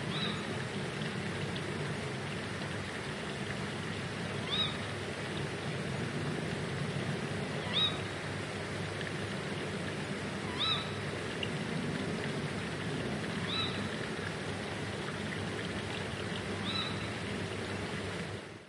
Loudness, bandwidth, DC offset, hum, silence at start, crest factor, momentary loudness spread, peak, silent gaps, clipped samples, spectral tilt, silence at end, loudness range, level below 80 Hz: -36 LUFS; 11.5 kHz; under 0.1%; none; 0 s; 18 dB; 6 LU; -20 dBFS; none; under 0.1%; -4.5 dB/octave; 0 s; 2 LU; -60 dBFS